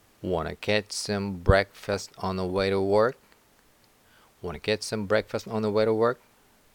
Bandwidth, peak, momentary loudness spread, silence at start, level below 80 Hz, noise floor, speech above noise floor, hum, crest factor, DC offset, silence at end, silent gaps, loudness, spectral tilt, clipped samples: 19 kHz; -6 dBFS; 9 LU; 0.2 s; -42 dBFS; -61 dBFS; 35 dB; none; 22 dB; under 0.1%; 0.6 s; none; -27 LUFS; -5 dB/octave; under 0.1%